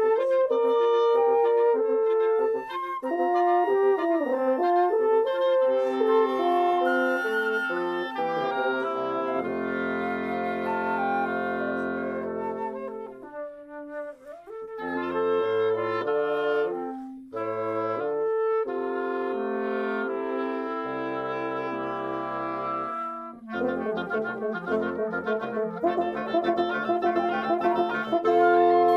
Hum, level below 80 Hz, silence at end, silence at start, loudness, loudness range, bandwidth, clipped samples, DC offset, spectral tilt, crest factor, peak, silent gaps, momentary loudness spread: none; -68 dBFS; 0 s; 0 s; -26 LUFS; 7 LU; 11.5 kHz; under 0.1%; under 0.1%; -6.5 dB/octave; 16 dB; -10 dBFS; none; 10 LU